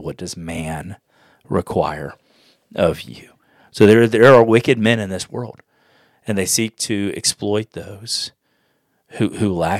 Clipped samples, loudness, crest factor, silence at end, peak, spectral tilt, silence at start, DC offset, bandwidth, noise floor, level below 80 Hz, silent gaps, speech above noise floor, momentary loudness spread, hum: 0.2%; -17 LUFS; 18 dB; 0 s; 0 dBFS; -4.5 dB/octave; 0 s; under 0.1%; 15.5 kHz; -65 dBFS; -52 dBFS; none; 48 dB; 21 LU; none